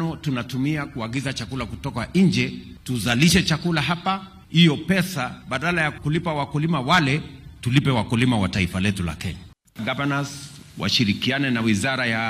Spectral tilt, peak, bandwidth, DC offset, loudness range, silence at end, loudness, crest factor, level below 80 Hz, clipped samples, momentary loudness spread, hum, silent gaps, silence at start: -5 dB/octave; -4 dBFS; 15.5 kHz; under 0.1%; 3 LU; 0 s; -22 LUFS; 18 dB; -46 dBFS; under 0.1%; 12 LU; none; none; 0 s